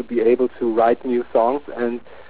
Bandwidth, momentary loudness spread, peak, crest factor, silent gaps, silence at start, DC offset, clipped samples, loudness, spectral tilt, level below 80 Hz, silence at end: 4 kHz; 8 LU; -6 dBFS; 14 dB; none; 0 s; 1%; under 0.1%; -20 LUFS; -10 dB/octave; -56 dBFS; 0.05 s